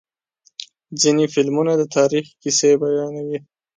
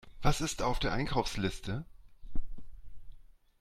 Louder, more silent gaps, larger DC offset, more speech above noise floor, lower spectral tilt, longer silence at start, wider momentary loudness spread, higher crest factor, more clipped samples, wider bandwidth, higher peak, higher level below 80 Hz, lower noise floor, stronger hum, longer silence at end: first, -18 LUFS vs -34 LUFS; neither; neither; first, 43 dB vs 21 dB; about the same, -4 dB/octave vs -4.5 dB/octave; first, 0.6 s vs 0.05 s; about the same, 19 LU vs 19 LU; about the same, 16 dB vs 20 dB; neither; second, 9.6 kHz vs 13.5 kHz; first, -4 dBFS vs -12 dBFS; second, -68 dBFS vs -40 dBFS; first, -61 dBFS vs -53 dBFS; neither; about the same, 0.4 s vs 0.4 s